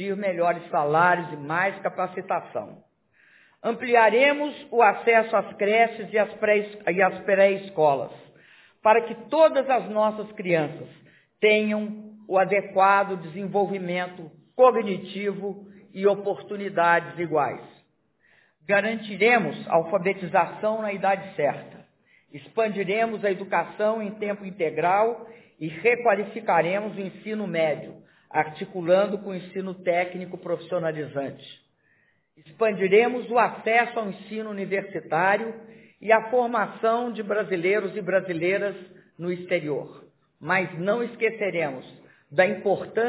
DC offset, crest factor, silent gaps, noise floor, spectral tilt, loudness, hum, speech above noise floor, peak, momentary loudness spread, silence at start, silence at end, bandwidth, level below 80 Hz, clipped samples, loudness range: under 0.1%; 20 dB; none; -66 dBFS; -9 dB/octave; -24 LUFS; none; 42 dB; -4 dBFS; 13 LU; 0 s; 0 s; 4 kHz; -76 dBFS; under 0.1%; 5 LU